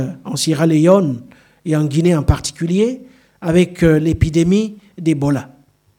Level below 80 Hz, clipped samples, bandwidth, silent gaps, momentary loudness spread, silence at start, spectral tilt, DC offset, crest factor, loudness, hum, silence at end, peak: -32 dBFS; under 0.1%; 16 kHz; none; 10 LU; 0 s; -6.5 dB/octave; under 0.1%; 16 dB; -16 LUFS; none; 0.5 s; 0 dBFS